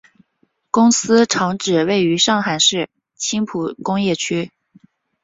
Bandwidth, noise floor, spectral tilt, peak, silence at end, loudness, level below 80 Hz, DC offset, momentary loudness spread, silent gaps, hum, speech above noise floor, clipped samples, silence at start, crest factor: 8 kHz; -64 dBFS; -3.5 dB/octave; -2 dBFS; 0.75 s; -17 LUFS; -60 dBFS; under 0.1%; 10 LU; none; none; 48 dB; under 0.1%; 0.75 s; 16 dB